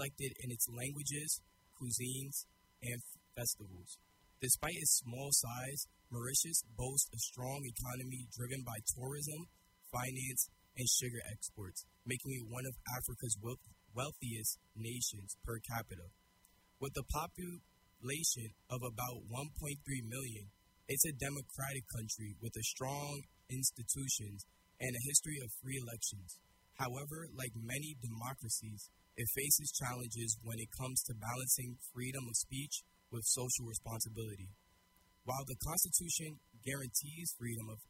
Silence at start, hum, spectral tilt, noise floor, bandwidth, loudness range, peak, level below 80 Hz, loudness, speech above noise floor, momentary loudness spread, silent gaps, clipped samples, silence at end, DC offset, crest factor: 0 s; none; -2.5 dB/octave; -71 dBFS; 16 kHz; 6 LU; -16 dBFS; -62 dBFS; -39 LUFS; 30 dB; 15 LU; none; under 0.1%; 0.05 s; under 0.1%; 26 dB